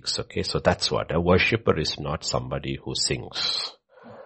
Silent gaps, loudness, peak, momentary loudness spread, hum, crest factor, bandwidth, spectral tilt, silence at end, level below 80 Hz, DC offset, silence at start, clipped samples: none; -25 LUFS; -6 dBFS; 9 LU; none; 20 dB; 8.8 kHz; -4 dB/octave; 0 s; -44 dBFS; under 0.1%; 0.05 s; under 0.1%